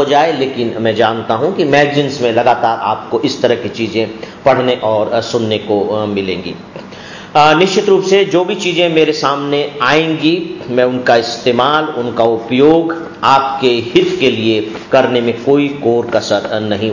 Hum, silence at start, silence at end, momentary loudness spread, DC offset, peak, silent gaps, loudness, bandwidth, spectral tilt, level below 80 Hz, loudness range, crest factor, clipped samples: none; 0 s; 0 s; 7 LU; under 0.1%; 0 dBFS; none; -13 LUFS; 7.4 kHz; -5 dB/octave; -50 dBFS; 3 LU; 12 dB; under 0.1%